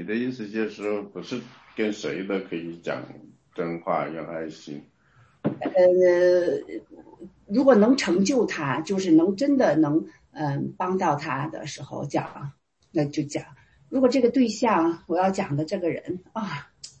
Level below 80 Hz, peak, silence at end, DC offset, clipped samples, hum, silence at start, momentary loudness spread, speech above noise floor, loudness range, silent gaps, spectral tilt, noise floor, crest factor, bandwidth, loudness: -64 dBFS; -6 dBFS; 0.1 s; under 0.1%; under 0.1%; none; 0 s; 16 LU; 35 dB; 9 LU; none; -6 dB/octave; -59 dBFS; 18 dB; 8.6 kHz; -24 LUFS